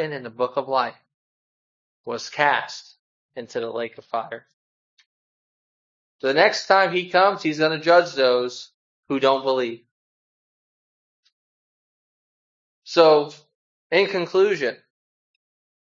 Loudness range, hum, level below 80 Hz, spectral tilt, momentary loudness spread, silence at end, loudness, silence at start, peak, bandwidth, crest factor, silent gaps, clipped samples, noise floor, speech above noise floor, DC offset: 11 LU; none; -78 dBFS; -4 dB/octave; 17 LU; 1.15 s; -21 LUFS; 0 s; 0 dBFS; 7.6 kHz; 24 dB; 1.14-2.04 s, 2.99-3.29 s, 4.53-4.97 s, 5.06-6.19 s, 8.74-9.03 s, 9.91-11.23 s, 11.32-12.82 s, 13.55-13.90 s; under 0.1%; under -90 dBFS; over 69 dB; under 0.1%